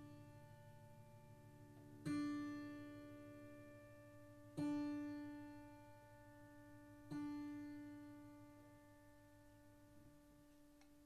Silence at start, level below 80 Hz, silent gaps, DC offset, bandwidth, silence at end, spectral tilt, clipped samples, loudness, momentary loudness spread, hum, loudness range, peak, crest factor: 0 s; -76 dBFS; none; under 0.1%; 13.5 kHz; 0 s; -6.5 dB/octave; under 0.1%; -52 LUFS; 22 LU; none; 7 LU; -34 dBFS; 20 dB